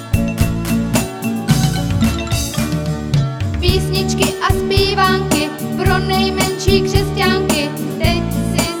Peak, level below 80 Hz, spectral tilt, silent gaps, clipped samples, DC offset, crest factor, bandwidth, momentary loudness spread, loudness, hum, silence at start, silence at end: 0 dBFS; -26 dBFS; -5 dB/octave; none; under 0.1%; under 0.1%; 16 dB; over 20 kHz; 5 LU; -16 LUFS; none; 0 s; 0 s